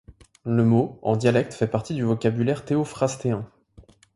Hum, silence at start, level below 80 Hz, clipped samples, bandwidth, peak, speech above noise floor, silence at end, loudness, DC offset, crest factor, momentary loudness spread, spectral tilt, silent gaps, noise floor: none; 0.1 s; -56 dBFS; under 0.1%; 11.5 kHz; -6 dBFS; 30 dB; 0.7 s; -23 LUFS; under 0.1%; 18 dB; 8 LU; -7 dB/octave; none; -52 dBFS